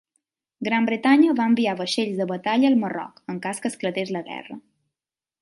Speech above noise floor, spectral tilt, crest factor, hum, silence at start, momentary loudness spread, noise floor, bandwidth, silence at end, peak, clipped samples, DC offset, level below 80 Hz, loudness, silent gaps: over 68 dB; -5 dB/octave; 18 dB; none; 0.6 s; 16 LU; under -90 dBFS; 11.5 kHz; 0.85 s; -6 dBFS; under 0.1%; under 0.1%; -72 dBFS; -22 LUFS; none